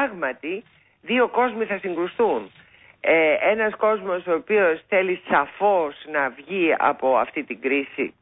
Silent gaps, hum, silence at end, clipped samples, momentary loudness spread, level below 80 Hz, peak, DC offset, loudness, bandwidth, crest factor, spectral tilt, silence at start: none; none; 0.1 s; under 0.1%; 8 LU; -64 dBFS; -6 dBFS; under 0.1%; -22 LUFS; 4 kHz; 16 dB; -9.5 dB/octave; 0 s